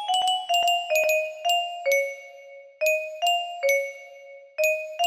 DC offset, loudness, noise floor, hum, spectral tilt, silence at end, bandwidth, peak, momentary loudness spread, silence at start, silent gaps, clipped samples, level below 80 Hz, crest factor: under 0.1%; -24 LUFS; -46 dBFS; none; 2.5 dB/octave; 0 s; 15.5 kHz; -10 dBFS; 15 LU; 0 s; none; under 0.1%; -78 dBFS; 14 dB